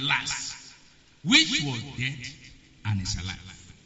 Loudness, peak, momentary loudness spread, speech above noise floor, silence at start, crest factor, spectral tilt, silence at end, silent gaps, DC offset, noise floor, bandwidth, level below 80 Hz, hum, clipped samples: -25 LUFS; -6 dBFS; 21 LU; 29 dB; 0 s; 24 dB; -2 dB/octave; 0.15 s; none; under 0.1%; -56 dBFS; 8 kHz; -50 dBFS; none; under 0.1%